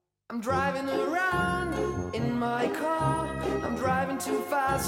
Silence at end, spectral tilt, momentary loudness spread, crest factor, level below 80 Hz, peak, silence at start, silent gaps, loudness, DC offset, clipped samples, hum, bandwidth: 0 s; -5.5 dB/octave; 4 LU; 14 dB; -48 dBFS; -14 dBFS; 0.3 s; none; -29 LUFS; under 0.1%; under 0.1%; none; 16.5 kHz